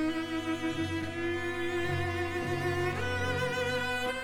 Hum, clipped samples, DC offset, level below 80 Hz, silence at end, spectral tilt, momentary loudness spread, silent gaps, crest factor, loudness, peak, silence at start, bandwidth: none; under 0.1%; under 0.1%; -54 dBFS; 0 s; -5.5 dB/octave; 3 LU; none; 12 dB; -32 LUFS; -20 dBFS; 0 s; 18 kHz